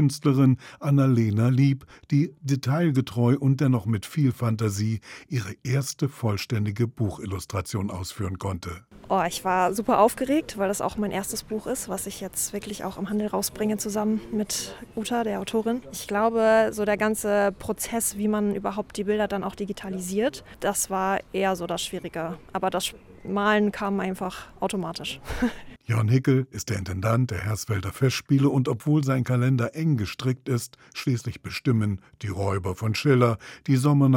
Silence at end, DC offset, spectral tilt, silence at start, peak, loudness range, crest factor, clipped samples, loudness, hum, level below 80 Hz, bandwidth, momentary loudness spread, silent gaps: 0 s; under 0.1%; -6 dB/octave; 0 s; -6 dBFS; 4 LU; 18 dB; under 0.1%; -25 LUFS; none; -52 dBFS; 18 kHz; 11 LU; none